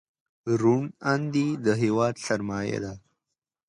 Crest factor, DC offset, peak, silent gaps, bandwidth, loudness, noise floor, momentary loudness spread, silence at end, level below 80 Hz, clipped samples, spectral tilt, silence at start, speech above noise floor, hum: 18 dB; under 0.1%; -10 dBFS; none; 11.5 kHz; -26 LUFS; -86 dBFS; 9 LU; 0.7 s; -60 dBFS; under 0.1%; -6.5 dB/octave; 0.45 s; 61 dB; none